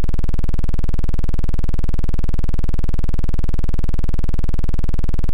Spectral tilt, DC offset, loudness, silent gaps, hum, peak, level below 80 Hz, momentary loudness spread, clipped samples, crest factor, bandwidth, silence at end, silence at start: -8 dB/octave; under 0.1%; -24 LUFS; none; none; -10 dBFS; -18 dBFS; 0 LU; under 0.1%; 2 dB; 2.4 kHz; 0 s; 0 s